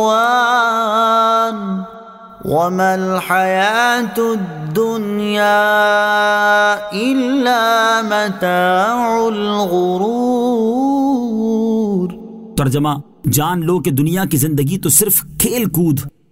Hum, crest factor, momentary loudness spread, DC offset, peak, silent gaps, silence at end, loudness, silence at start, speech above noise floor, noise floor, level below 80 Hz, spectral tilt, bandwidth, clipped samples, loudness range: none; 14 dB; 7 LU; under 0.1%; 0 dBFS; none; 0.2 s; -15 LUFS; 0 s; 21 dB; -36 dBFS; -46 dBFS; -4.5 dB/octave; 16.5 kHz; under 0.1%; 3 LU